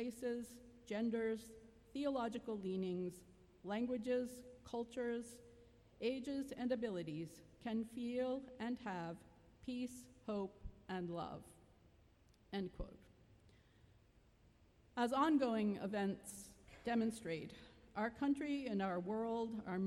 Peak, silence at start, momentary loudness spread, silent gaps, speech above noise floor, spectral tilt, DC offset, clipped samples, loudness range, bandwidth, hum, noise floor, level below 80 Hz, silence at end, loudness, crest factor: -24 dBFS; 0 s; 15 LU; none; 28 dB; -6 dB/octave; under 0.1%; under 0.1%; 9 LU; 15.5 kHz; none; -70 dBFS; -66 dBFS; 0 s; -43 LUFS; 18 dB